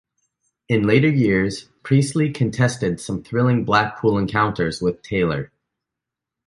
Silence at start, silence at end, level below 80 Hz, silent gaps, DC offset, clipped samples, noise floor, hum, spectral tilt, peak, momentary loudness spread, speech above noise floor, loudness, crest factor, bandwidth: 0.7 s; 1 s; -48 dBFS; none; under 0.1%; under 0.1%; -85 dBFS; none; -6.5 dB/octave; -2 dBFS; 8 LU; 66 dB; -20 LUFS; 18 dB; 11.5 kHz